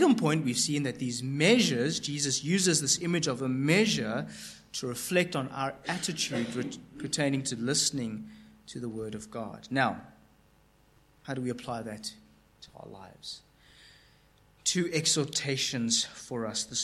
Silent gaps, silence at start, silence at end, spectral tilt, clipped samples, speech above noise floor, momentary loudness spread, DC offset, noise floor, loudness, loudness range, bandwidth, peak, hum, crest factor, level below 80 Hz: none; 0 s; 0 s; -3.5 dB/octave; under 0.1%; 33 dB; 17 LU; under 0.1%; -63 dBFS; -29 LUFS; 14 LU; 15 kHz; -10 dBFS; none; 22 dB; -66 dBFS